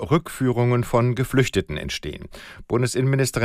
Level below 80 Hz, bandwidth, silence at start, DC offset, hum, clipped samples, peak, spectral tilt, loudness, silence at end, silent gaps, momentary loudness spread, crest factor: -44 dBFS; 15.5 kHz; 0 s; under 0.1%; none; under 0.1%; -6 dBFS; -6 dB/octave; -22 LUFS; 0 s; none; 14 LU; 16 dB